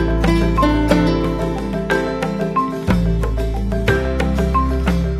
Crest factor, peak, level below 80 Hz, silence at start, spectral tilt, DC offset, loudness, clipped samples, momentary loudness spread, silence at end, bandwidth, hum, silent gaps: 16 dB; 0 dBFS; -22 dBFS; 0 s; -7 dB/octave; under 0.1%; -18 LUFS; under 0.1%; 6 LU; 0 s; 14 kHz; none; none